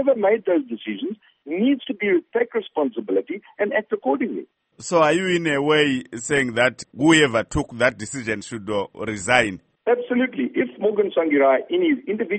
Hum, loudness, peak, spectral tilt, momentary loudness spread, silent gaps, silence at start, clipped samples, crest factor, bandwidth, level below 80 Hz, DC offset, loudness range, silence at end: none; -21 LUFS; 0 dBFS; -4.5 dB/octave; 11 LU; none; 0 s; under 0.1%; 20 dB; 8.8 kHz; -50 dBFS; under 0.1%; 4 LU; 0 s